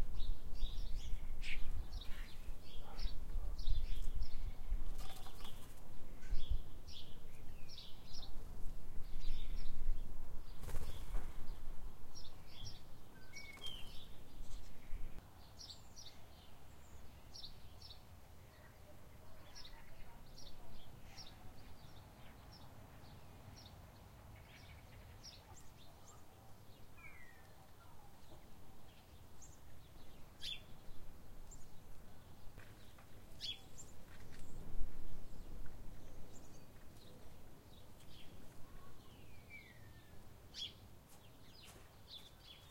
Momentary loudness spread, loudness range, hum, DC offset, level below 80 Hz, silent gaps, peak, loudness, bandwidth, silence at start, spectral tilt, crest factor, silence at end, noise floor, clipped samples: 14 LU; 11 LU; none; under 0.1%; -46 dBFS; none; -20 dBFS; -54 LUFS; 11.5 kHz; 0 s; -4 dB/octave; 18 dB; 0 s; -59 dBFS; under 0.1%